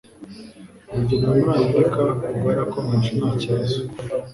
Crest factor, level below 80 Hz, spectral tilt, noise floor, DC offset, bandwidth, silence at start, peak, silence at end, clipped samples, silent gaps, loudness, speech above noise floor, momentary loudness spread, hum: 16 dB; -46 dBFS; -8 dB/octave; -42 dBFS; under 0.1%; 11.5 kHz; 0.2 s; -4 dBFS; 0 s; under 0.1%; none; -21 LUFS; 22 dB; 15 LU; none